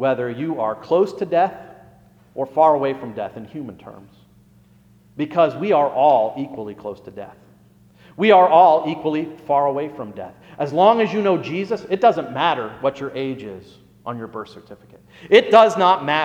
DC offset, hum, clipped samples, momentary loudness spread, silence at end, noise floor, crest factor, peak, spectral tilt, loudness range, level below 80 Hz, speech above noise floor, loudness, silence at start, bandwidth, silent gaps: under 0.1%; 60 Hz at -55 dBFS; under 0.1%; 21 LU; 0 s; -52 dBFS; 20 dB; 0 dBFS; -6 dB/octave; 6 LU; -62 dBFS; 33 dB; -18 LUFS; 0 s; 9 kHz; none